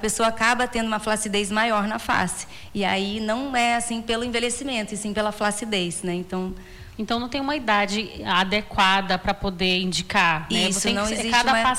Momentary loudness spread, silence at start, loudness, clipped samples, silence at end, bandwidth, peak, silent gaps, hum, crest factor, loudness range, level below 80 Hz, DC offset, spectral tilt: 8 LU; 0 s; -23 LUFS; under 0.1%; 0 s; 16.5 kHz; -8 dBFS; none; none; 16 dB; 5 LU; -44 dBFS; under 0.1%; -3 dB/octave